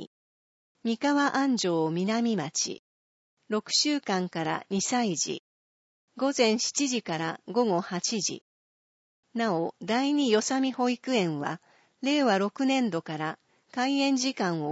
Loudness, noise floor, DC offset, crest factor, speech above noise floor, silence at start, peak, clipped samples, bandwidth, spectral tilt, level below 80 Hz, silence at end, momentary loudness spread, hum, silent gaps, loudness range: -27 LUFS; under -90 dBFS; under 0.1%; 18 dB; over 63 dB; 0 s; -10 dBFS; under 0.1%; 8 kHz; -3.5 dB/octave; -80 dBFS; 0 s; 9 LU; none; 0.07-0.75 s, 2.79-3.37 s, 5.39-6.08 s, 8.41-9.23 s; 2 LU